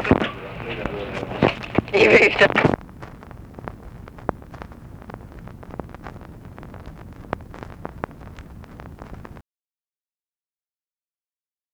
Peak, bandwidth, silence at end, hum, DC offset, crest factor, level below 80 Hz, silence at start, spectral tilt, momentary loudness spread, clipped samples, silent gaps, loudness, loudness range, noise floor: -2 dBFS; 19.5 kHz; 2.3 s; none; under 0.1%; 24 dB; -44 dBFS; 0 s; -6 dB/octave; 25 LU; under 0.1%; none; -20 LUFS; 21 LU; under -90 dBFS